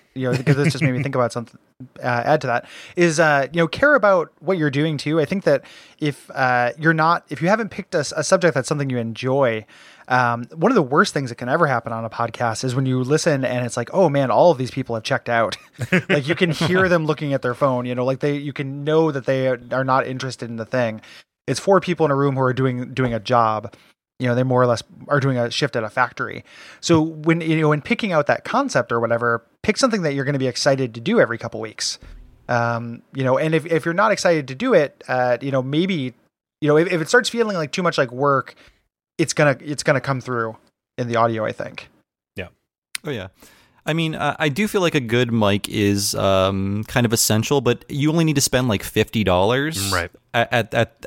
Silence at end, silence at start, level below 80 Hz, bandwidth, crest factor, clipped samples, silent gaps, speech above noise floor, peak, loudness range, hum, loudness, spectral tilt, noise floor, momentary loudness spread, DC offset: 0 s; 0.15 s; -54 dBFS; 16.5 kHz; 18 dB; under 0.1%; 42.78-42.82 s; 31 dB; -2 dBFS; 3 LU; none; -20 LUFS; -5 dB/octave; -51 dBFS; 9 LU; under 0.1%